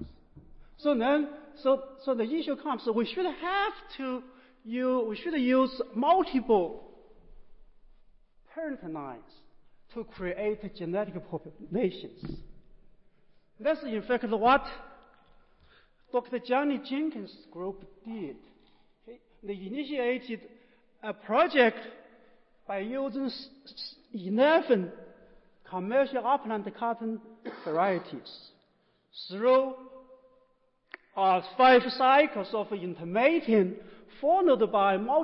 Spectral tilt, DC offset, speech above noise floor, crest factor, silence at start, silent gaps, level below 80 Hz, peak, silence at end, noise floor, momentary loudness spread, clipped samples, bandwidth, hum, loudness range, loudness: -9.5 dB/octave; under 0.1%; 41 dB; 18 dB; 0 s; none; -58 dBFS; -12 dBFS; 0 s; -70 dBFS; 20 LU; under 0.1%; 5.8 kHz; none; 11 LU; -28 LUFS